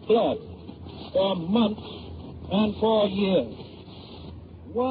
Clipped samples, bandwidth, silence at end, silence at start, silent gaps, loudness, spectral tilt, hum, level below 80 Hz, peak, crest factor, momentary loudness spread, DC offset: under 0.1%; 5 kHz; 0 s; 0 s; none; -25 LUFS; -5.5 dB/octave; none; -52 dBFS; -10 dBFS; 16 dB; 20 LU; under 0.1%